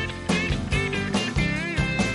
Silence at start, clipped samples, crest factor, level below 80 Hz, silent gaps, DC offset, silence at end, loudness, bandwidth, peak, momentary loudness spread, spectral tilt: 0 s; under 0.1%; 14 dB; -34 dBFS; none; under 0.1%; 0 s; -25 LUFS; 11.5 kHz; -10 dBFS; 1 LU; -5 dB/octave